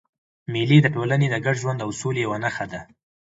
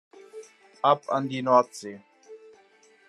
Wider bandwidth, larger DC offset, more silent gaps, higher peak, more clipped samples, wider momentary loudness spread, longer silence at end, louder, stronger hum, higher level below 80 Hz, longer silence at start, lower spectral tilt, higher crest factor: second, 8 kHz vs 12 kHz; neither; neither; first, -2 dBFS vs -6 dBFS; neither; second, 15 LU vs 25 LU; second, 0.4 s vs 0.75 s; about the same, -22 LUFS vs -24 LUFS; neither; first, -58 dBFS vs -84 dBFS; first, 0.5 s vs 0.35 s; about the same, -6 dB/octave vs -5.5 dB/octave; about the same, 20 dB vs 22 dB